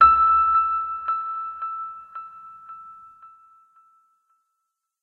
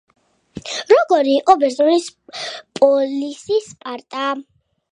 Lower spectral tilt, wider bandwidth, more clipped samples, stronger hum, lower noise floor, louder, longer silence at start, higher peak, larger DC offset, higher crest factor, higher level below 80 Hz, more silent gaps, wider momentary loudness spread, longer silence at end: first, -5.5 dB/octave vs -3.5 dB/octave; second, 4.3 kHz vs 10.5 kHz; neither; neither; first, -79 dBFS vs -37 dBFS; second, -21 LUFS vs -17 LUFS; second, 0 s vs 0.55 s; second, -4 dBFS vs 0 dBFS; neither; about the same, 20 dB vs 18 dB; first, -52 dBFS vs -62 dBFS; neither; first, 25 LU vs 17 LU; first, 1.75 s vs 0.5 s